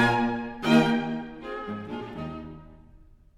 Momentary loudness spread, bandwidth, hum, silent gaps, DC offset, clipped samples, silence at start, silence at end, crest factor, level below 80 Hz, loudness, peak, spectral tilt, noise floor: 18 LU; 12 kHz; none; none; under 0.1%; under 0.1%; 0 s; 0.4 s; 20 dB; -54 dBFS; -27 LUFS; -8 dBFS; -6 dB/octave; -53 dBFS